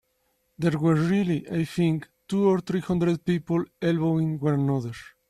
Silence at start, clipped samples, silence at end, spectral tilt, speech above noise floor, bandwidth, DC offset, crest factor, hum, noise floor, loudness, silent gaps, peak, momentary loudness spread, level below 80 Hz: 0.6 s; under 0.1%; 0.25 s; -8 dB/octave; 47 dB; 12.5 kHz; under 0.1%; 14 dB; none; -72 dBFS; -25 LUFS; none; -10 dBFS; 6 LU; -58 dBFS